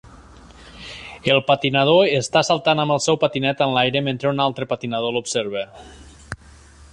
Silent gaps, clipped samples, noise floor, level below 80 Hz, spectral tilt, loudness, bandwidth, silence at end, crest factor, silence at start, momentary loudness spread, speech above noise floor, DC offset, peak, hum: none; under 0.1%; -46 dBFS; -50 dBFS; -4.5 dB/octave; -19 LUFS; 11 kHz; 0.6 s; 18 dB; 0.05 s; 20 LU; 27 dB; under 0.1%; -2 dBFS; none